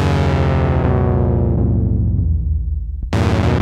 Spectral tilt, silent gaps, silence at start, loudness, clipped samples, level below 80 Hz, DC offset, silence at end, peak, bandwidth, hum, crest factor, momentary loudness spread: -8 dB/octave; none; 0 s; -17 LUFS; under 0.1%; -22 dBFS; under 0.1%; 0 s; -4 dBFS; 9 kHz; none; 12 dB; 6 LU